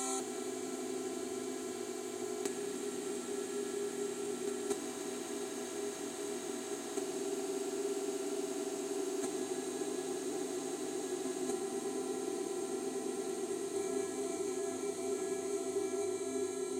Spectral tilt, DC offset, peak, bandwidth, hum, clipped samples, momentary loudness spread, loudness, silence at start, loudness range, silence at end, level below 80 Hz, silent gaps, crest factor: -3 dB/octave; under 0.1%; -20 dBFS; 16 kHz; none; under 0.1%; 3 LU; -39 LUFS; 0 s; 2 LU; 0 s; -82 dBFS; none; 18 dB